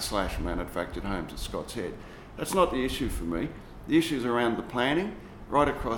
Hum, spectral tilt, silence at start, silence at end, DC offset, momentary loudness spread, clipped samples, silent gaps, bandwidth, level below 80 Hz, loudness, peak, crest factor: none; -5 dB/octave; 0 s; 0 s; under 0.1%; 11 LU; under 0.1%; none; 18 kHz; -42 dBFS; -29 LUFS; -10 dBFS; 20 dB